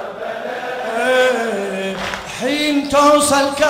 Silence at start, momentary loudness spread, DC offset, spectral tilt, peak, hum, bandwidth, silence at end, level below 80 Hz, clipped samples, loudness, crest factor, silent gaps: 0 s; 13 LU; under 0.1%; -2.5 dB/octave; -2 dBFS; none; 16 kHz; 0 s; -48 dBFS; under 0.1%; -17 LUFS; 16 dB; none